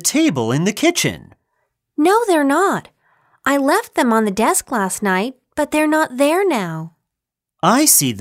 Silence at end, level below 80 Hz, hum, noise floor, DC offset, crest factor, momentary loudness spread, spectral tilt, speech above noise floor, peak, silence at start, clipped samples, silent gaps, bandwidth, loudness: 0 s; -58 dBFS; none; -83 dBFS; under 0.1%; 16 dB; 10 LU; -3.5 dB/octave; 67 dB; 0 dBFS; 0 s; under 0.1%; none; 16 kHz; -16 LUFS